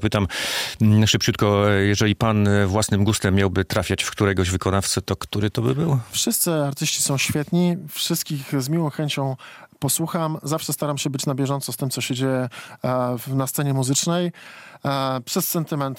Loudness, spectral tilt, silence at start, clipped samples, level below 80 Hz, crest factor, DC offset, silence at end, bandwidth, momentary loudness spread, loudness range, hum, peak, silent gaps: -22 LUFS; -4.5 dB/octave; 0 s; under 0.1%; -50 dBFS; 18 dB; under 0.1%; 0 s; 17 kHz; 7 LU; 5 LU; none; -4 dBFS; none